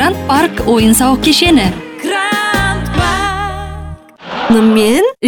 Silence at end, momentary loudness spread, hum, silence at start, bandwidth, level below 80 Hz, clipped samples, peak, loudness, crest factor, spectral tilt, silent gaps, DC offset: 0 s; 16 LU; none; 0 s; 19 kHz; -28 dBFS; under 0.1%; 0 dBFS; -11 LUFS; 12 dB; -4 dB/octave; none; under 0.1%